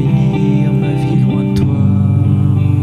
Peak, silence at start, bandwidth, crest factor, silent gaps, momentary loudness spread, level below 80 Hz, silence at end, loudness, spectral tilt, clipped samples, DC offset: -2 dBFS; 0 s; 9.4 kHz; 10 dB; none; 2 LU; -34 dBFS; 0 s; -13 LUFS; -9.5 dB/octave; under 0.1%; under 0.1%